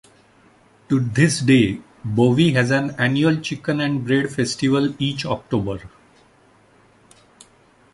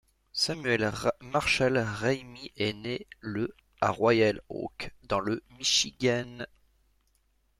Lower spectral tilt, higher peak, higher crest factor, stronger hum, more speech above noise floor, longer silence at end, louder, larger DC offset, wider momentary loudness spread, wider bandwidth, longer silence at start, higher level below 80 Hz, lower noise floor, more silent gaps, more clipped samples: first, -5.5 dB/octave vs -3.5 dB/octave; first, -2 dBFS vs -12 dBFS; about the same, 20 dB vs 20 dB; neither; second, 36 dB vs 41 dB; first, 2.05 s vs 1.15 s; first, -19 LUFS vs -29 LUFS; neither; second, 8 LU vs 13 LU; second, 11.5 kHz vs 15 kHz; first, 0.9 s vs 0.35 s; first, -50 dBFS vs -56 dBFS; second, -54 dBFS vs -70 dBFS; neither; neither